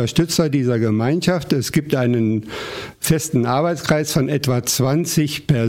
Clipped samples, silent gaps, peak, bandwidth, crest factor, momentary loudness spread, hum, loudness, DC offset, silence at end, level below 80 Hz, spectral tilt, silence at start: under 0.1%; none; -2 dBFS; 16.5 kHz; 16 dB; 3 LU; none; -19 LUFS; under 0.1%; 0 s; -46 dBFS; -5 dB/octave; 0 s